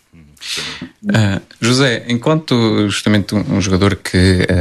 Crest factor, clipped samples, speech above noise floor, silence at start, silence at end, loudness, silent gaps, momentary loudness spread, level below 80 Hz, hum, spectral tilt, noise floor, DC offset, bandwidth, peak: 14 dB; under 0.1%; 21 dB; 0.4 s; 0 s; -15 LUFS; none; 9 LU; -40 dBFS; none; -5.5 dB/octave; -34 dBFS; under 0.1%; 13.5 kHz; 0 dBFS